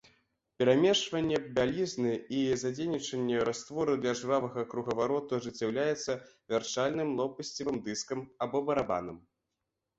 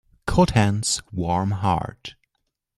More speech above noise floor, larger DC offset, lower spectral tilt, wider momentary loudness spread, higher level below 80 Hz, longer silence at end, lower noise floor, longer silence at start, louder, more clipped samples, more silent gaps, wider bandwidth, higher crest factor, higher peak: about the same, 55 dB vs 55 dB; neither; about the same, -4.5 dB/octave vs -5 dB/octave; second, 8 LU vs 16 LU; second, -64 dBFS vs -40 dBFS; first, 0.8 s vs 0.65 s; first, -86 dBFS vs -77 dBFS; first, 0.6 s vs 0.25 s; second, -32 LUFS vs -22 LUFS; neither; neither; second, 8 kHz vs 13 kHz; about the same, 20 dB vs 20 dB; second, -12 dBFS vs -2 dBFS